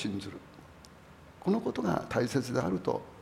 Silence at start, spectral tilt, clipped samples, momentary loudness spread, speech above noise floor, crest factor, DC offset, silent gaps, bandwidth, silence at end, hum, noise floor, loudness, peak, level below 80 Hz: 0 s; -6.5 dB/octave; under 0.1%; 22 LU; 22 dB; 20 dB; under 0.1%; none; 16 kHz; 0 s; none; -54 dBFS; -32 LUFS; -14 dBFS; -60 dBFS